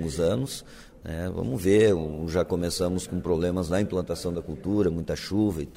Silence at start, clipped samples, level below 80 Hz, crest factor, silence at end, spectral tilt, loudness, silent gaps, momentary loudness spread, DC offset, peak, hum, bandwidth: 0 s; under 0.1%; -44 dBFS; 18 dB; 0 s; -6 dB/octave; -26 LUFS; none; 11 LU; under 0.1%; -8 dBFS; none; 16 kHz